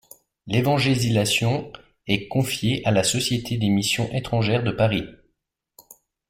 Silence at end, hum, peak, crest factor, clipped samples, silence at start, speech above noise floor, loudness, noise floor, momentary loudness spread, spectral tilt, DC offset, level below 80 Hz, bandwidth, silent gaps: 1.15 s; none; -6 dBFS; 16 dB; under 0.1%; 0.45 s; 54 dB; -22 LUFS; -76 dBFS; 6 LU; -4.5 dB/octave; under 0.1%; -50 dBFS; 16.5 kHz; none